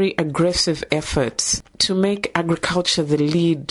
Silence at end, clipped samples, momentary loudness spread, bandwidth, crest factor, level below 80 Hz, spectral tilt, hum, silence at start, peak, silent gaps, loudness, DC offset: 0.05 s; under 0.1%; 4 LU; 11.5 kHz; 16 dB; -42 dBFS; -4 dB/octave; none; 0 s; -4 dBFS; none; -19 LUFS; under 0.1%